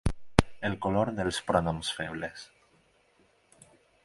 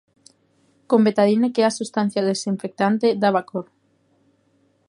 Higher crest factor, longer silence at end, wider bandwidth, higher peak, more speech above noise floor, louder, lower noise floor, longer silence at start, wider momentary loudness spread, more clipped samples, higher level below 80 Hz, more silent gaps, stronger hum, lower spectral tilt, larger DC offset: first, 32 dB vs 18 dB; first, 1.6 s vs 1.25 s; about the same, 11.5 kHz vs 11 kHz; first, 0 dBFS vs -4 dBFS; second, 36 dB vs 44 dB; second, -30 LUFS vs -20 LUFS; about the same, -66 dBFS vs -63 dBFS; second, 0.05 s vs 0.9 s; first, 12 LU vs 8 LU; neither; first, -44 dBFS vs -72 dBFS; neither; second, none vs 50 Hz at -40 dBFS; about the same, -5.5 dB/octave vs -5.5 dB/octave; neither